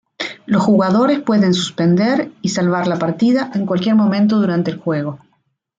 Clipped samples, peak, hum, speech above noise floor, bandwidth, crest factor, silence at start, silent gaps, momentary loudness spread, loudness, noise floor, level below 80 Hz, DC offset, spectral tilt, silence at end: under 0.1%; -2 dBFS; none; 50 dB; 7.8 kHz; 14 dB; 0.2 s; none; 8 LU; -16 LUFS; -65 dBFS; -60 dBFS; under 0.1%; -6.5 dB/octave; 0.6 s